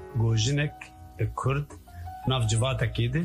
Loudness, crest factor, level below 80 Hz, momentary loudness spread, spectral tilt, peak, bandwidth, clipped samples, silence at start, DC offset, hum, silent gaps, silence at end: -28 LUFS; 14 dB; -44 dBFS; 17 LU; -5 dB/octave; -14 dBFS; 12 kHz; under 0.1%; 0 s; under 0.1%; none; none; 0 s